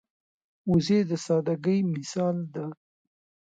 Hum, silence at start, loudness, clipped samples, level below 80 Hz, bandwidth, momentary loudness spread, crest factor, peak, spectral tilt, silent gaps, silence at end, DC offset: none; 0.65 s; -27 LUFS; under 0.1%; -60 dBFS; 9 kHz; 13 LU; 16 dB; -12 dBFS; -7 dB/octave; none; 0.85 s; under 0.1%